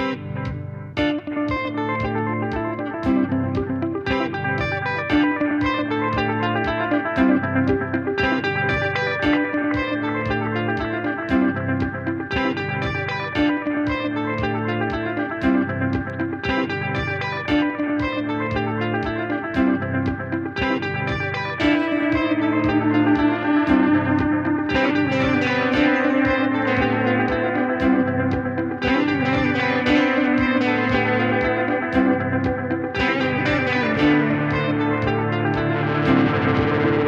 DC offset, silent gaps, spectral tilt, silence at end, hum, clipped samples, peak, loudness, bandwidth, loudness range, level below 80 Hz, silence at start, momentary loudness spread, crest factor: under 0.1%; none; -7.5 dB/octave; 0 s; none; under 0.1%; -6 dBFS; -21 LUFS; 7.2 kHz; 4 LU; -42 dBFS; 0 s; 6 LU; 16 dB